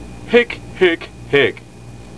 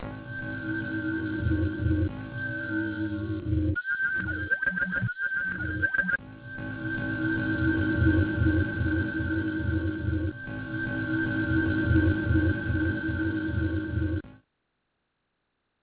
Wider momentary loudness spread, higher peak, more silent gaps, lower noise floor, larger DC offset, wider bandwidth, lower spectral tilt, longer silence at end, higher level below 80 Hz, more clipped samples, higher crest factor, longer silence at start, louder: about the same, 9 LU vs 8 LU; first, 0 dBFS vs -12 dBFS; neither; second, -37 dBFS vs -78 dBFS; first, 0.7% vs under 0.1%; first, 11 kHz vs 4 kHz; second, -5.5 dB/octave vs -11 dB/octave; second, 0.15 s vs 1.45 s; about the same, -42 dBFS vs -38 dBFS; neither; about the same, 18 dB vs 16 dB; about the same, 0 s vs 0 s; first, -16 LUFS vs -28 LUFS